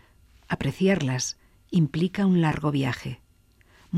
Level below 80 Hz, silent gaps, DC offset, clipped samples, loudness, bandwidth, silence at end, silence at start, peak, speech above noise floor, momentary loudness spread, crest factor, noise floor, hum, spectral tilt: -52 dBFS; none; under 0.1%; under 0.1%; -25 LUFS; 13.5 kHz; 0 s; 0.5 s; -10 dBFS; 35 dB; 12 LU; 16 dB; -59 dBFS; none; -6 dB/octave